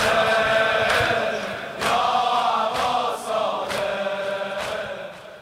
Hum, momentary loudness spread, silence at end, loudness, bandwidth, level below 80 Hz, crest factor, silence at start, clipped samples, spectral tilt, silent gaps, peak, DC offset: none; 10 LU; 0 s; -22 LUFS; 16 kHz; -52 dBFS; 16 dB; 0 s; under 0.1%; -3 dB/octave; none; -6 dBFS; under 0.1%